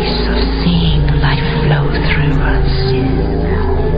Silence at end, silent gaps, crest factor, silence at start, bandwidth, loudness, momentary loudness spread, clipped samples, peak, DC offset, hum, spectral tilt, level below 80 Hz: 0 s; none; 12 dB; 0 s; 5.2 kHz; -14 LUFS; 3 LU; under 0.1%; 0 dBFS; under 0.1%; none; -9.5 dB/octave; -16 dBFS